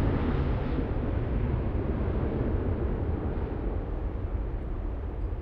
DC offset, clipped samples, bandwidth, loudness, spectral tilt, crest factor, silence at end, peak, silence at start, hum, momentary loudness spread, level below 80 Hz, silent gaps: under 0.1%; under 0.1%; 5 kHz; -31 LUFS; -11 dB/octave; 14 dB; 0 s; -14 dBFS; 0 s; none; 6 LU; -32 dBFS; none